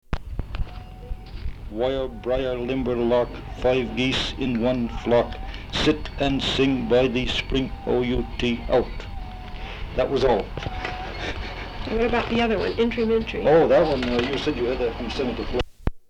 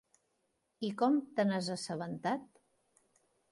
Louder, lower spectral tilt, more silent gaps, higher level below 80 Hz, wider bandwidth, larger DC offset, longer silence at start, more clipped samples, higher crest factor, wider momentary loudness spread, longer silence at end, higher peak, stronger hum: first, -24 LUFS vs -35 LUFS; about the same, -6 dB/octave vs -5.5 dB/octave; neither; first, -34 dBFS vs -82 dBFS; about the same, 10.5 kHz vs 11.5 kHz; neither; second, 0.1 s vs 0.8 s; neither; about the same, 18 dB vs 18 dB; first, 15 LU vs 10 LU; second, 0.1 s vs 1.05 s; first, -6 dBFS vs -20 dBFS; neither